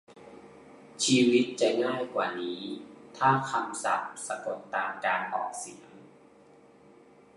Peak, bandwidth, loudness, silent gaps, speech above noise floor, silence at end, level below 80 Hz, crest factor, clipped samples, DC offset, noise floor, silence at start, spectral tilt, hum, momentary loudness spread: -10 dBFS; 11.5 kHz; -29 LUFS; none; 28 dB; 1.3 s; -76 dBFS; 20 dB; under 0.1%; under 0.1%; -57 dBFS; 0.1 s; -4 dB/octave; none; 18 LU